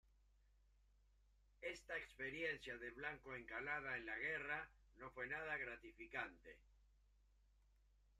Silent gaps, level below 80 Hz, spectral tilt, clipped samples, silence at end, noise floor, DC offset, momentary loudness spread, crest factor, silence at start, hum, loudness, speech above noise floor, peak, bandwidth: none; -72 dBFS; -4.5 dB/octave; under 0.1%; 1.3 s; -75 dBFS; under 0.1%; 12 LU; 22 dB; 1.6 s; 50 Hz at -70 dBFS; -49 LUFS; 25 dB; -30 dBFS; 13.5 kHz